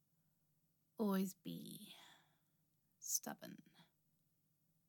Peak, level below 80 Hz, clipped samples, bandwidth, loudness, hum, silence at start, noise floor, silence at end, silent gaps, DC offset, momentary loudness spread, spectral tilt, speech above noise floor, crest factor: -24 dBFS; under -90 dBFS; under 0.1%; 17.5 kHz; -44 LUFS; none; 1 s; -82 dBFS; 1.05 s; none; under 0.1%; 21 LU; -4 dB/octave; 37 dB; 24 dB